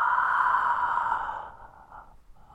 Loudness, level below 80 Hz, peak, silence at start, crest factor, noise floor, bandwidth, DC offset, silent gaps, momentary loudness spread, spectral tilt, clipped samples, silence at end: -25 LUFS; -56 dBFS; -12 dBFS; 0 s; 16 dB; -51 dBFS; 9.8 kHz; under 0.1%; none; 14 LU; -3 dB/octave; under 0.1%; 0.2 s